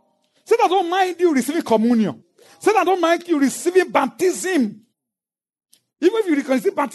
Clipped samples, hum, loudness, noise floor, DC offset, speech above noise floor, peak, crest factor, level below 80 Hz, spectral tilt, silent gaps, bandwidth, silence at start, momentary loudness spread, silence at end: under 0.1%; none; -19 LUFS; under -90 dBFS; under 0.1%; over 72 dB; -4 dBFS; 16 dB; -78 dBFS; -4.5 dB/octave; none; 12.5 kHz; 0.5 s; 4 LU; 0 s